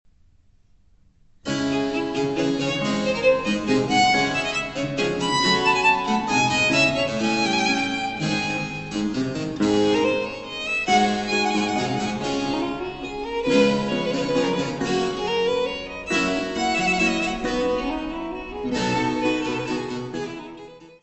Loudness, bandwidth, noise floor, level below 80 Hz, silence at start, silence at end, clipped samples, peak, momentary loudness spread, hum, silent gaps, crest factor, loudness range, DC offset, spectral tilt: -22 LUFS; 8.4 kHz; -57 dBFS; -48 dBFS; 1.45 s; 0.1 s; under 0.1%; -6 dBFS; 11 LU; none; none; 18 dB; 4 LU; under 0.1%; -4 dB/octave